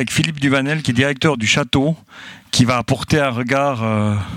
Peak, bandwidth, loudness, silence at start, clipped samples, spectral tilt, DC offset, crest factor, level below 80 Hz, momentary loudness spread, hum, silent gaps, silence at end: 0 dBFS; 16.5 kHz; -17 LUFS; 0 s; under 0.1%; -5 dB/octave; under 0.1%; 18 dB; -46 dBFS; 5 LU; none; none; 0 s